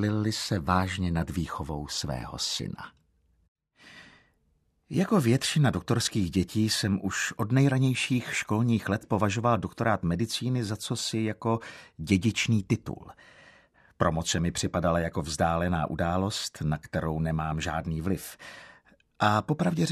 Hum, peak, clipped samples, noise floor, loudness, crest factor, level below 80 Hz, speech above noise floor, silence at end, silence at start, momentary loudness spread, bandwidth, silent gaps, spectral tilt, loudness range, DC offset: none; -8 dBFS; under 0.1%; -70 dBFS; -28 LUFS; 20 dB; -48 dBFS; 43 dB; 0 s; 0 s; 8 LU; 14 kHz; 3.48-3.55 s; -5 dB/octave; 5 LU; under 0.1%